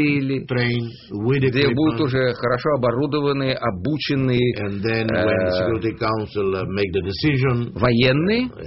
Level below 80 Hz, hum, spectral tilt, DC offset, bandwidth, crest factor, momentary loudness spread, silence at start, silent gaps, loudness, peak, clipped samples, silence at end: -46 dBFS; none; -5.5 dB/octave; under 0.1%; 6 kHz; 16 dB; 5 LU; 0 s; none; -20 LUFS; -4 dBFS; under 0.1%; 0 s